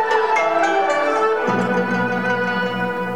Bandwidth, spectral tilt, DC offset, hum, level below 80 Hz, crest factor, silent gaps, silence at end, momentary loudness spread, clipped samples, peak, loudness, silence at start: 16.5 kHz; -5.5 dB/octave; 0.7%; none; -58 dBFS; 12 dB; none; 0 s; 4 LU; under 0.1%; -6 dBFS; -18 LUFS; 0 s